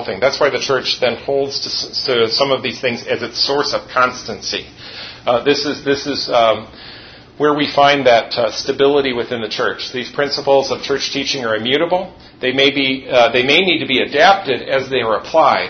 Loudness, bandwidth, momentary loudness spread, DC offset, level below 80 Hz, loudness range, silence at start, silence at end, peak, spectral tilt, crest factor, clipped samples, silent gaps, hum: -15 LUFS; 6.6 kHz; 10 LU; under 0.1%; -50 dBFS; 4 LU; 0 s; 0 s; 0 dBFS; -3.5 dB/octave; 16 dB; under 0.1%; none; none